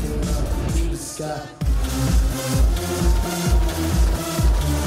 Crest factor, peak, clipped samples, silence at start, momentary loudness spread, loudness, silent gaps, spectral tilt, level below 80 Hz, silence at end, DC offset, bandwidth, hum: 12 dB; -8 dBFS; under 0.1%; 0 s; 6 LU; -22 LUFS; none; -5.5 dB/octave; -22 dBFS; 0 s; under 0.1%; 16 kHz; none